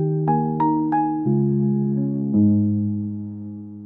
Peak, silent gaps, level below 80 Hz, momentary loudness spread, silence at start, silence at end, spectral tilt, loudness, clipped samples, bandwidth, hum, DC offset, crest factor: -8 dBFS; none; -62 dBFS; 13 LU; 0 s; 0 s; -14 dB/octave; -21 LUFS; under 0.1%; 2.7 kHz; none; under 0.1%; 12 dB